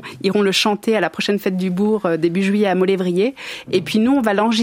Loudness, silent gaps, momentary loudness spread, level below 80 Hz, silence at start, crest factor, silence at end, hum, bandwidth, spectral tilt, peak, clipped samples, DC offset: -18 LUFS; none; 5 LU; -60 dBFS; 0 s; 16 dB; 0 s; none; 16 kHz; -5.5 dB/octave; -2 dBFS; under 0.1%; under 0.1%